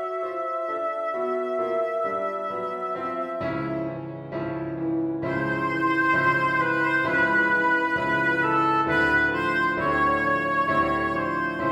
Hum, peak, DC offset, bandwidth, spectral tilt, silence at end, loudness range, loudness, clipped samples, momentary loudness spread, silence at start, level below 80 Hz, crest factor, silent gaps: none; -10 dBFS; under 0.1%; 11.5 kHz; -6.5 dB/octave; 0 s; 7 LU; -24 LUFS; under 0.1%; 9 LU; 0 s; -52 dBFS; 14 dB; none